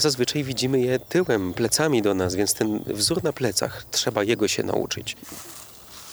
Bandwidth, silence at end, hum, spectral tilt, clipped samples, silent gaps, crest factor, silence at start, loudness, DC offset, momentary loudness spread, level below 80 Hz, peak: over 20 kHz; 0 s; none; -3.5 dB/octave; under 0.1%; none; 18 dB; 0 s; -23 LUFS; under 0.1%; 15 LU; -54 dBFS; -6 dBFS